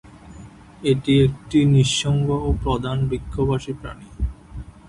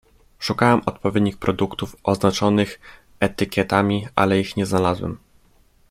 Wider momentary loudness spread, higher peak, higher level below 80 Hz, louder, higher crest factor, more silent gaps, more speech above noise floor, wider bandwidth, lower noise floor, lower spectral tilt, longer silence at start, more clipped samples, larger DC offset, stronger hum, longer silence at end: first, 15 LU vs 9 LU; second, -6 dBFS vs -2 dBFS; first, -34 dBFS vs -50 dBFS; about the same, -21 LUFS vs -21 LUFS; about the same, 16 dB vs 20 dB; neither; second, 22 dB vs 36 dB; second, 11 kHz vs 15.5 kHz; second, -42 dBFS vs -56 dBFS; about the same, -6 dB/octave vs -6 dB/octave; second, 0.05 s vs 0.4 s; neither; neither; neither; second, 0.2 s vs 0.75 s